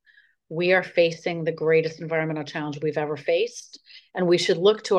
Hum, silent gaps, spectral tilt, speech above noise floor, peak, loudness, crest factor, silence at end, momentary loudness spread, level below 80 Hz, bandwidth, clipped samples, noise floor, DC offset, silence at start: none; none; -5 dB/octave; 36 dB; -6 dBFS; -24 LUFS; 18 dB; 0 s; 11 LU; -74 dBFS; 10 kHz; under 0.1%; -60 dBFS; under 0.1%; 0.5 s